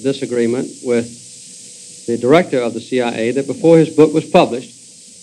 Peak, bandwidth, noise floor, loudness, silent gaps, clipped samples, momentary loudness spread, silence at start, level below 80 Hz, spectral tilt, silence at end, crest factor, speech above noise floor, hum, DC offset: 0 dBFS; 11.5 kHz; -36 dBFS; -15 LUFS; none; 0.3%; 22 LU; 0 s; -58 dBFS; -6 dB/octave; 0.55 s; 16 dB; 22 dB; none; under 0.1%